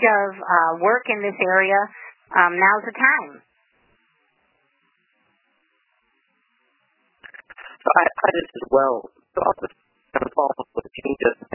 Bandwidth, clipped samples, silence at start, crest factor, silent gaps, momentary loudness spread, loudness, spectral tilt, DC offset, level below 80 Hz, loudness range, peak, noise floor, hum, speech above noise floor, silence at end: 3.1 kHz; under 0.1%; 0 s; 22 dB; none; 14 LU; -20 LUFS; -8.5 dB/octave; under 0.1%; -60 dBFS; 7 LU; 0 dBFS; -67 dBFS; none; 47 dB; 0.2 s